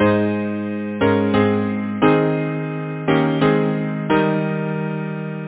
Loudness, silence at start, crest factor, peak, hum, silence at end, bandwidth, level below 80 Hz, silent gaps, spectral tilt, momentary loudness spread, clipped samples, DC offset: -19 LUFS; 0 s; 16 dB; -2 dBFS; none; 0 s; 4 kHz; -50 dBFS; none; -11.5 dB/octave; 8 LU; under 0.1%; under 0.1%